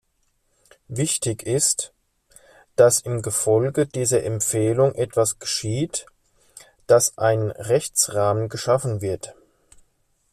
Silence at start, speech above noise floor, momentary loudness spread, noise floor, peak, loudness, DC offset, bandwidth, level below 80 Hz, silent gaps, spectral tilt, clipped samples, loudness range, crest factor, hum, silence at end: 0.9 s; 47 dB; 10 LU; -68 dBFS; -4 dBFS; -21 LUFS; under 0.1%; 15 kHz; -56 dBFS; none; -4 dB/octave; under 0.1%; 2 LU; 20 dB; none; 1 s